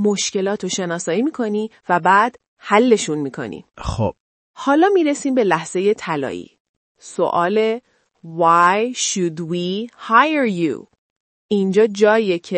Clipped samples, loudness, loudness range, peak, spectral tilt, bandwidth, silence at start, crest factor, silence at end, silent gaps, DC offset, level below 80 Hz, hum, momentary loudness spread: under 0.1%; -18 LUFS; 2 LU; 0 dBFS; -4.5 dB/octave; 8.8 kHz; 0 s; 18 dB; 0 s; 2.48-2.57 s, 4.20-4.54 s, 6.60-6.95 s, 10.98-11.49 s; under 0.1%; -46 dBFS; none; 13 LU